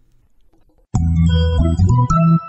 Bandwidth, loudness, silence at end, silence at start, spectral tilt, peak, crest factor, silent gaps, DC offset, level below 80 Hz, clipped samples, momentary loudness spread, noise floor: 8.2 kHz; -16 LUFS; 0 s; 0.95 s; -8 dB/octave; -4 dBFS; 12 dB; none; under 0.1%; -26 dBFS; under 0.1%; 6 LU; -52 dBFS